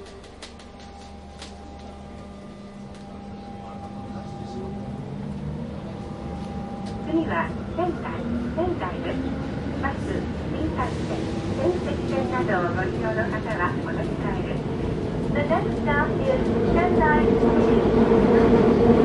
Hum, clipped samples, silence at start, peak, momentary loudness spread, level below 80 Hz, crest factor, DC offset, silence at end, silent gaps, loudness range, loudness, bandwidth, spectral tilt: none; under 0.1%; 0 s; -6 dBFS; 21 LU; -38 dBFS; 18 dB; under 0.1%; 0 s; none; 17 LU; -24 LUFS; 11 kHz; -8 dB/octave